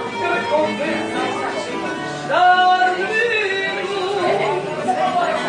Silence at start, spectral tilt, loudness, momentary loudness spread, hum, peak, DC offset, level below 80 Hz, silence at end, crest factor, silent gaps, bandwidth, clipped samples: 0 s; -4 dB/octave; -18 LUFS; 10 LU; none; -4 dBFS; under 0.1%; -62 dBFS; 0 s; 16 dB; none; 10.5 kHz; under 0.1%